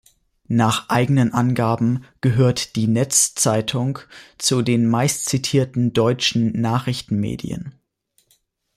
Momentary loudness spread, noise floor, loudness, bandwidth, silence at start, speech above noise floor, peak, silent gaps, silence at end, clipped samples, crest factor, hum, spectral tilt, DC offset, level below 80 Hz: 7 LU; -65 dBFS; -19 LUFS; 15 kHz; 0.5 s; 46 dB; -4 dBFS; none; 1.05 s; under 0.1%; 16 dB; none; -4.5 dB/octave; under 0.1%; -52 dBFS